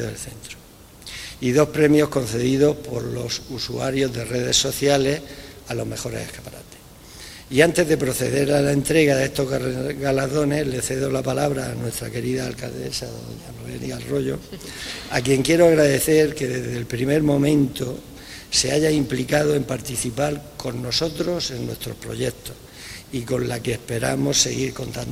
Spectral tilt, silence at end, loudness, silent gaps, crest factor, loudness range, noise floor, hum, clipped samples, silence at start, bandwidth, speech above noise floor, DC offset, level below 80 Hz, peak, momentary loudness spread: -4.5 dB/octave; 0 s; -21 LUFS; none; 22 dB; 7 LU; -43 dBFS; none; under 0.1%; 0 s; 16 kHz; 21 dB; under 0.1%; -46 dBFS; 0 dBFS; 18 LU